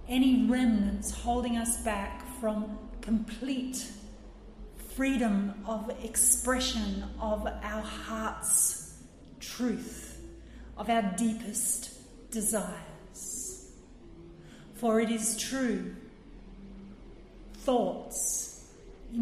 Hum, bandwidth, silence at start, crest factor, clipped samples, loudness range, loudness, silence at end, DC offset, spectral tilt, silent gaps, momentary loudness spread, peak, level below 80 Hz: none; 15.5 kHz; 0 s; 22 dB; under 0.1%; 6 LU; -30 LUFS; 0 s; under 0.1%; -3.5 dB/octave; none; 24 LU; -10 dBFS; -48 dBFS